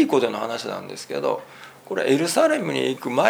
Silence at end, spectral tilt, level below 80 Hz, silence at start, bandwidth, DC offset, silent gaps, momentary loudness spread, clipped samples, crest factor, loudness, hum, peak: 0 s; -4 dB/octave; -74 dBFS; 0 s; over 20 kHz; under 0.1%; none; 12 LU; under 0.1%; 20 dB; -23 LUFS; none; -2 dBFS